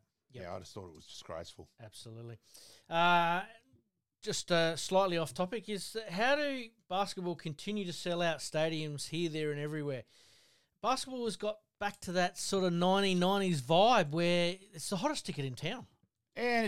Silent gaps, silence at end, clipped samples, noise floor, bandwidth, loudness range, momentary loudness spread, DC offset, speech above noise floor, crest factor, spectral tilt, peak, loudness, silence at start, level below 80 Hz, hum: none; 0 s; under 0.1%; -73 dBFS; 16 kHz; 7 LU; 20 LU; 0.1%; 39 dB; 20 dB; -4.5 dB/octave; -14 dBFS; -33 LUFS; 0 s; -68 dBFS; none